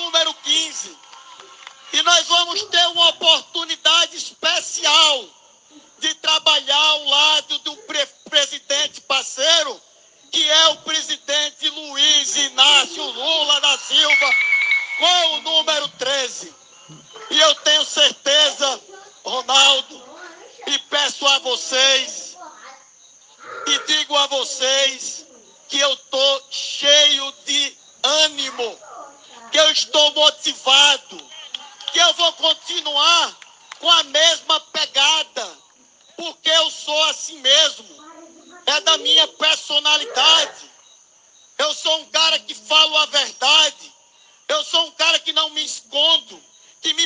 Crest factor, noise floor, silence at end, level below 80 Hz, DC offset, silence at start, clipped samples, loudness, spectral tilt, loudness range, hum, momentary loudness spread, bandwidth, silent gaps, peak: 18 dB; -53 dBFS; 0 s; -80 dBFS; under 0.1%; 0 s; under 0.1%; -15 LUFS; 2 dB/octave; 4 LU; none; 12 LU; 10.5 kHz; none; 0 dBFS